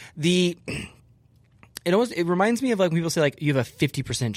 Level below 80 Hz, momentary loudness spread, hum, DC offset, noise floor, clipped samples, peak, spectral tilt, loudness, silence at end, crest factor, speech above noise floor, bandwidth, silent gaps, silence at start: -56 dBFS; 12 LU; none; under 0.1%; -58 dBFS; under 0.1%; -8 dBFS; -5.5 dB/octave; -24 LUFS; 0 s; 16 dB; 35 dB; 16 kHz; none; 0 s